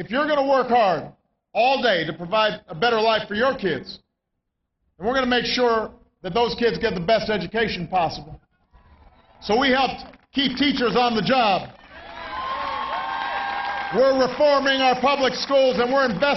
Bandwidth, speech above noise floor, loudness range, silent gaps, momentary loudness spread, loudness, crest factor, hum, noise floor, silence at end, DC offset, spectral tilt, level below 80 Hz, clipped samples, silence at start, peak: 6.2 kHz; 57 dB; 4 LU; none; 11 LU; -21 LUFS; 14 dB; none; -78 dBFS; 0 s; under 0.1%; -5 dB/octave; -50 dBFS; under 0.1%; 0 s; -8 dBFS